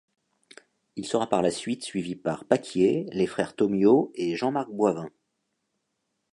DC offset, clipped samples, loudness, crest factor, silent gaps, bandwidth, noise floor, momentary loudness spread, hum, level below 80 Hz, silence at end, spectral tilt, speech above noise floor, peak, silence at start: under 0.1%; under 0.1%; -26 LUFS; 22 dB; none; 11 kHz; -79 dBFS; 11 LU; none; -66 dBFS; 1.25 s; -6 dB/octave; 53 dB; -4 dBFS; 0.95 s